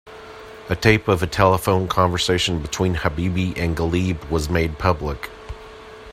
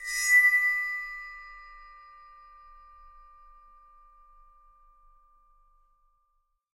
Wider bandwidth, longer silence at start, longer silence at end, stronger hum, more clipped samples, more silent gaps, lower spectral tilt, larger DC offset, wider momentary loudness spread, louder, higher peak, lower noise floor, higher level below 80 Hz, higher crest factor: about the same, 15.5 kHz vs 16 kHz; about the same, 0.05 s vs 0 s; second, 0 s vs 4.95 s; neither; neither; neither; first, -5.5 dB/octave vs 4.5 dB/octave; neither; second, 20 LU vs 28 LU; about the same, -20 LUFS vs -22 LUFS; first, 0 dBFS vs -12 dBFS; second, -40 dBFS vs -74 dBFS; first, -36 dBFS vs -60 dBFS; about the same, 20 dB vs 20 dB